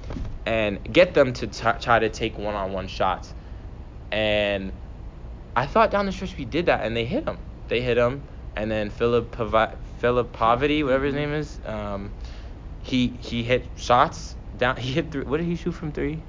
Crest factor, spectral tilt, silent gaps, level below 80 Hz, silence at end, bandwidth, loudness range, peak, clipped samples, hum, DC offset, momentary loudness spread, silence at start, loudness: 20 dB; -6 dB/octave; none; -38 dBFS; 0 s; 7.6 kHz; 3 LU; -4 dBFS; under 0.1%; none; under 0.1%; 18 LU; 0 s; -24 LUFS